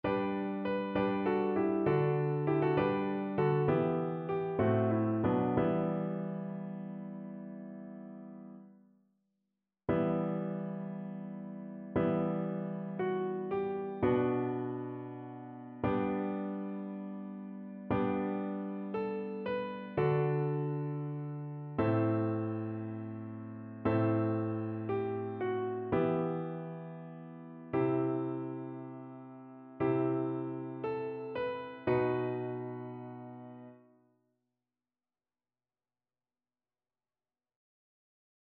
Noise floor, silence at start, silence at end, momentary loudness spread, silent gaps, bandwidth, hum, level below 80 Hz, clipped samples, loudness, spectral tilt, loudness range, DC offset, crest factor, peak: under -90 dBFS; 0.05 s; 4.65 s; 16 LU; none; 4.8 kHz; none; -64 dBFS; under 0.1%; -34 LUFS; -8 dB/octave; 7 LU; under 0.1%; 18 dB; -18 dBFS